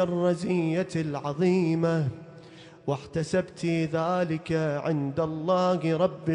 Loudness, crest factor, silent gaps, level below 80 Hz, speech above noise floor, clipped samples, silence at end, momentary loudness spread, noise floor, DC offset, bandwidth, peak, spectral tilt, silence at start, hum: -27 LUFS; 16 dB; none; -60 dBFS; 22 dB; under 0.1%; 0 s; 8 LU; -48 dBFS; under 0.1%; 10.5 kHz; -12 dBFS; -7.5 dB/octave; 0 s; none